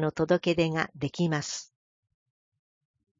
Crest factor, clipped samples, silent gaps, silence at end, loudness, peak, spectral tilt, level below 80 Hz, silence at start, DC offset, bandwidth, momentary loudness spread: 20 dB; under 0.1%; none; 1.55 s; -28 LUFS; -10 dBFS; -5.5 dB/octave; -62 dBFS; 0 s; under 0.1%; 7.6 kHz; 9 LU